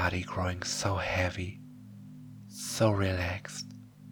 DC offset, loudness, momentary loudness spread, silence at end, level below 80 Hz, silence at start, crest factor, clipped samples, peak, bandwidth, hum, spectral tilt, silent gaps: under 0.1%; -32 LUFS; 21 LU; 0 s; -54 dBFS; 0 s; 20 dB; under 0.1%; -12 dBFS; 19.5 kHz; 50 Hz at -55 dBFS; -4.5 dB/octave; none